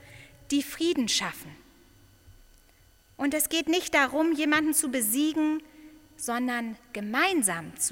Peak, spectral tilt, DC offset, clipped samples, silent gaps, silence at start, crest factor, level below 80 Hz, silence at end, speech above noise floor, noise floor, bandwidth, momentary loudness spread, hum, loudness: -10 dBFS; -2 dB/octave; under 0.1%; under 0.1%; none; 0.05 s; 20 dB; -60 dBFS; 0 s; 32 dB; -59 dBFS; 17 kHz; 12 LU; none; -26 LUFS